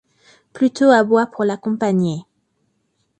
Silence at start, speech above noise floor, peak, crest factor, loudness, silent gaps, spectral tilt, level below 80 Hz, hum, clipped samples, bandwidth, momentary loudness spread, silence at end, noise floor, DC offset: 0.55 s; 52 dB; 0 dBFS; 18 dB; -17 LUFS; none; -6.5 dB/octave; -64 dBFS; none; under 0.1%; 9 kHz; 9 LU; 1 s; -68 dBFS; under 0.1%